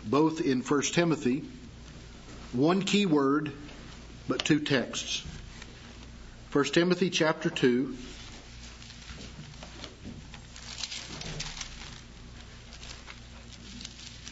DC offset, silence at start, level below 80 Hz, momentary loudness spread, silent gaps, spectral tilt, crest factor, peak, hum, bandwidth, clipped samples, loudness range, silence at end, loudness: under 0.1%; 0 s; -50 dBFS; 21 LU; none; -4.5 dB/octave; 22 dB; -8 dBFS; none; 8 kHz; under 0.1%; 12 LU; 0 s; -28 LUFS